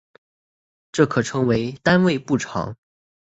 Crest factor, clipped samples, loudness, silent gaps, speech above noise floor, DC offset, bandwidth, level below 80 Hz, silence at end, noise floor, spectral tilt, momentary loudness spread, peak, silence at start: 20 dB; under 0.1%; -21 LUFS; none; over 70 dB; under 0.1%; 8 kHz; -52 dBFS; 0.5 s; under -90 dBFS; -6 dB/octave; 11 LU; -2 dBFS; 0.95 s